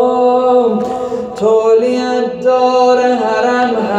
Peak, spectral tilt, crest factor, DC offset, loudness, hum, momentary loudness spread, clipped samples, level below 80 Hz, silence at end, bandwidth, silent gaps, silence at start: -2 dBFS; -5 dB/octave; 10 dB; under 0.1%; -12 LUFS; none; 6 LU; under 0.1%; -54 dBFS; 0 s; 9.2 kHz; none; 0 s